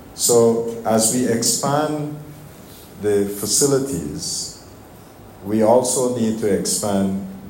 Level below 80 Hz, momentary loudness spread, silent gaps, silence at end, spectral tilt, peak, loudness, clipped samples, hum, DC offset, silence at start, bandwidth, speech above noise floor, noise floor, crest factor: -52 dBFS; 12 LU; none; 0 s; -4 dB/octave; -4 dBFS; -18 LUFS; under 0.1%; none; under 0.1%; 0 s; 16.5 kHz; 23 dB; -42 dBFS; 16 dB